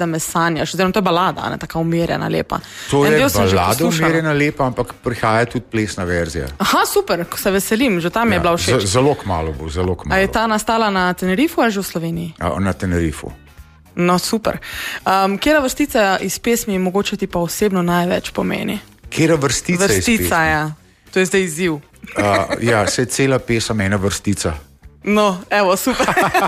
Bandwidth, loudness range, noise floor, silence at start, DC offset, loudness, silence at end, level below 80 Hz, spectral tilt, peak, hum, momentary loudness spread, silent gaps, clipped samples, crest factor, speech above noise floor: 15.5 kHz; 2 LU; -43 dBFS; 0 s; under 0.1%; -17 LUFS; 0 s; -38 dBFS; -4.5 dB/octave; -2 dBFS; none; 8 LU; none; under 0.1%; 14 dB; 26 dB